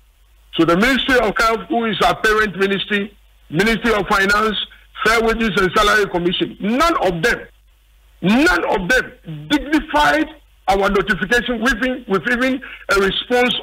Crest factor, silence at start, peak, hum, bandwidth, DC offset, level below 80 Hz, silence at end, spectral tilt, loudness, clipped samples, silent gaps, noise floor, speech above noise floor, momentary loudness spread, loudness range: 14 dB; 0.55 s; -4 dBFS; none; 16 kHz; under 0.1%; -36 dBFS; 0 s; -4.5 dB/octave; -17 LUFS; under 0.1%; none; -51 dBFS; 35 dB; 7 LU; 2 LU